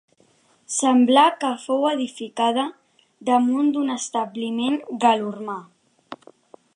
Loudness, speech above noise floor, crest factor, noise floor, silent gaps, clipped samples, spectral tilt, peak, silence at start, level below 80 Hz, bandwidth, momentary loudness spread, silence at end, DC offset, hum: -21 LUFS; 39 dB; 18 dB; -60 dBFS; none; under 0.1%; -3 dB/octave; -4 dBFS; 0.7 s; -80 dBFS; 11.5 kHz; 16 LU; 0.6 s; under 0.1%; none